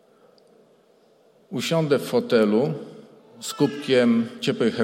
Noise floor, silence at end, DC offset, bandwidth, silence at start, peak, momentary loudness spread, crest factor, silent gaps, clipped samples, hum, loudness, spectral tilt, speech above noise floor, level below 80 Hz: -58 dBFS; 0 s; under 0.1%; 16.5 kHz; 1.5 s; -6 dBFS; 15 LU; 18 dB; none; under 0.1%; none; -22 LUFS; -5.5 dB/octave; 37 dB; -72 dBFS